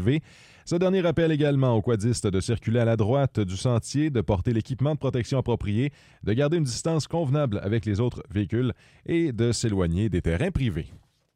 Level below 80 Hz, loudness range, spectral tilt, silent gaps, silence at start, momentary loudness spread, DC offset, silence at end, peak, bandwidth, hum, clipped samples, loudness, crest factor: -44 dBFS; 2 LU; -6.5 dB/octave; none; 0 s; 6 LU; under 0.1%; 0.4 s; -10 dBFS; 11.5 kHz; none; under 0.1%; -25 LUFS; 14 dB